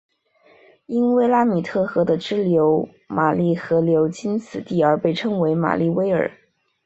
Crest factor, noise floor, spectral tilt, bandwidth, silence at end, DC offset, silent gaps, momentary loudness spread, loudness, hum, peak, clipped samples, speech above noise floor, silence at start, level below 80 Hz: 18 dB; -56 dBFS; -7.5 dB/octave; 8 kHz; 0.55 s; under 0.1%; none; 8 LU; -20 LUFS; none; -2 dBFS; under 0.1%; 37 dB; 0.9 s; -60 dBFS